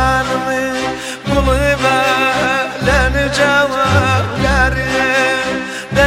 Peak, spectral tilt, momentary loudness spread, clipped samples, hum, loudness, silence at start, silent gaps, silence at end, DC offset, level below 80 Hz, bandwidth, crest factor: 0 dBFS; -4.5 dB/octave; 6 LU; under 0.1%; none; -14 LUFS; 0 s; none; 0 s; under 0.1%; -24 dBFS; 16.5 kHz; 14 dB